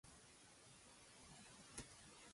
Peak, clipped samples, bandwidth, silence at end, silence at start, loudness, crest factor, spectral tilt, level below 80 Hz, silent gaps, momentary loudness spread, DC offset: -36 dBFS; under 0.1%; 11.5 kHz; 0 s; 0.05 s; -61 LUFS; 26 dB; -2.5 dB/octave; -76 dBFS; none; 7 LU; under 0.1%